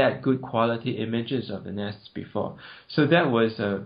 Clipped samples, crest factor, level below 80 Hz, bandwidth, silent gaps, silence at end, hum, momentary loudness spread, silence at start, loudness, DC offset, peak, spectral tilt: under 0.1%; 20 dB; -64 dBFS; 5.2 kHz; none; 0 s; none; 14 LU; 0 s; -26 LUFS; under 0.1%; -6 dBFS; -5 dB/octave